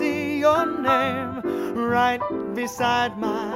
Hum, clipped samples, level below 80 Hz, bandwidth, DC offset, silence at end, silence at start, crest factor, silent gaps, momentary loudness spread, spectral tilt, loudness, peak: none; under 0.1%; -56 dBFS; 16 kHz; under 0.1%; 0 s; 0 s; 18 dB; none; 7 LU; -5 dB/octave; -23 LUFS; -6 dBFS